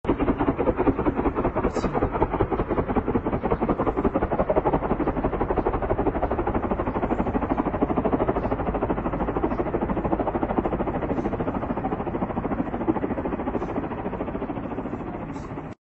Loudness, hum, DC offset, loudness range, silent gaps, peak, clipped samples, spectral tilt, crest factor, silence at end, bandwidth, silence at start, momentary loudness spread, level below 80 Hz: -26 LUFS; none; under 0.1%; 4 LU; none; -6 dBFS; under 0.1%; -8 dB/octave; 18 dB; 0.1 s; 8 kHz; 0.05 s; 7 LU; -36 dBFS